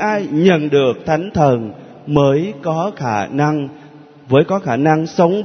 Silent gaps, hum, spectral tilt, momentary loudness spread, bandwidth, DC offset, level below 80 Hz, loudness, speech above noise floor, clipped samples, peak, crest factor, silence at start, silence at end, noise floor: none; none; -7.5 dB/octave; 7 LU; 6.6 kHz; under 0.1%; -50 dBFS; -16 LUFS; 25 dB; under 0.1%; 0 dBFS; 16 dB; 0 s; 0 s; -40 dBFS